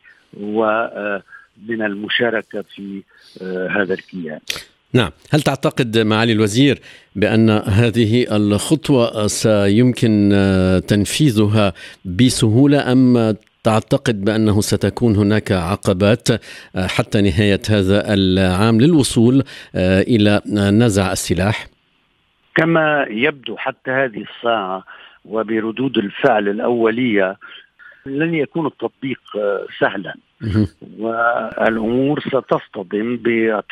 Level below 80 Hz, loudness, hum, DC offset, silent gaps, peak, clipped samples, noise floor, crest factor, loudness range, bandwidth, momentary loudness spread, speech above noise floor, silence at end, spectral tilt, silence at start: -46 dBFS; -17 LUFS; none; under 0.1%; none; -2 dBFS; under 0.1%; -61 dBFS; 16 dB; 7 LU; 14.5 kHz; 12 LU; 45 dB; 0.1 s; -6 dB/octave; 0.35 s